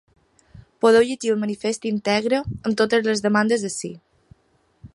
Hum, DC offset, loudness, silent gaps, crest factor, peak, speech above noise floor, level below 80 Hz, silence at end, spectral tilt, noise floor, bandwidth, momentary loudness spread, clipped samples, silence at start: none; under 0.1%; -21 LUFS; none; 18 dB; -4 dBFS; 43 dB; -54 dBFS; 0.1 s; -4.5 dB/octave; -63 dBFS; 11.5 kHz; 9 LU; under 0.1%; 0.55 s